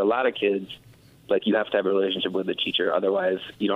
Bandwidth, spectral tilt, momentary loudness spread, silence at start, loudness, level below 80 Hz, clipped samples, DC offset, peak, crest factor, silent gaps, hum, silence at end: 5.8 kHz; -6.5 dB/octave; 5 LU; 0 s; -24 LUFS; -68 dBFS; under 0.1%; under 0.1%; -10 dBFS; 16 dB; none; none; 0 s